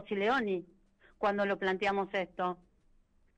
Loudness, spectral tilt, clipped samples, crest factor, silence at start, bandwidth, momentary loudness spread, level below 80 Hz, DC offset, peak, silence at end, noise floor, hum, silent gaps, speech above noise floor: -33 LUFS; -6 dB/octave; under 0.1%; 14 dB; 0 s; 8.8 kHz; 7 LU; -66 dBFS; under 0.1%; -22 dBFS; 0.8 s; -67 dBFS; none; none; 35 dB